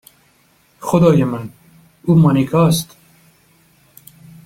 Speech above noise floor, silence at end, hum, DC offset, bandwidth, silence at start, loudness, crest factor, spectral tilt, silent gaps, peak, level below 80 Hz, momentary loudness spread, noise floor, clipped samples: 42 dB; 1.6 s; none; under 0.1%; 16 kHz; 0.8 s; -15 LUFS; 16 dB; -7 dB/octave; none; -2 dBFS; -48 dBFS; 17 LU; -55 dBFS; under 0.1%